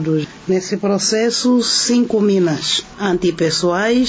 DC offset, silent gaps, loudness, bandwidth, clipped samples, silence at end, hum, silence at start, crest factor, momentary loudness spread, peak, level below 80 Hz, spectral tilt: under 0.1%; none; -16 LUFS; 8 kHz; under 0.1%; 0 s; none; 0 s; 12 dB; 6 LU; -4 dBFS; -50 dBFS; -4 dB/octave